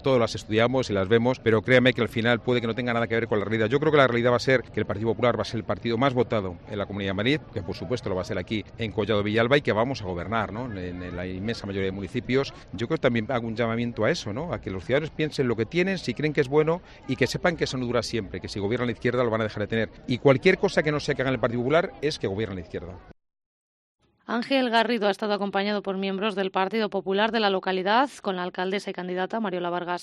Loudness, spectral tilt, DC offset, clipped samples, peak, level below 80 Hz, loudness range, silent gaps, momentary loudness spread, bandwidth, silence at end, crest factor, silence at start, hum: -25 LUFS; -6 dB/octave; under 0.1%; under 0.1%; -6 dBFS; -52 dBFS; 5 LU; 23.46-23.98 s; 10 LU; 12.5 kHz; 0 s; 20 dB; 0 s; none